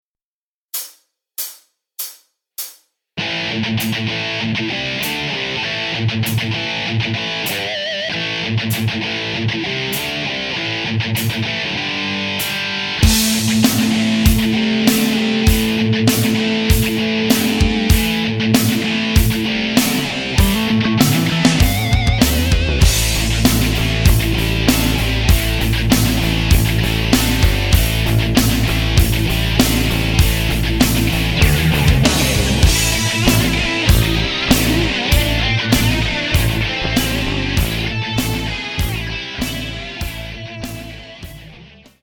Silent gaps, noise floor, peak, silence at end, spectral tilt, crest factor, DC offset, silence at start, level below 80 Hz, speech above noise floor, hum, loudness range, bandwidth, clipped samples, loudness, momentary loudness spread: none; under -90 dBFS; 0 dBFS; 0.35 s; -4.5 dB/octave; 16 dB; under 0.1%; 0.75 s; -22 dBFS; over 70 dB; none; 6 LU; 20 kHz; under 0.1%; -16 LUFS; 9 LU